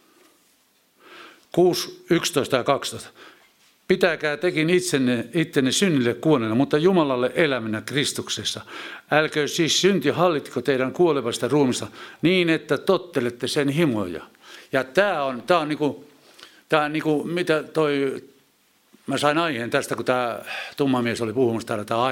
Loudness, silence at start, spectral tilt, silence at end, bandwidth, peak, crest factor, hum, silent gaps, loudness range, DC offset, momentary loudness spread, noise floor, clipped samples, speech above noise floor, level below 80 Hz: -22 LUFS; 1.1 s; -4.5 dB/octave; 0 s; 17 kHz; -2 dBFS; 22 dB; none; none; 4 LU; under 0.1%; 8 LU; -62 dBFS; under 0.1%; 40 dB; -66 dBFS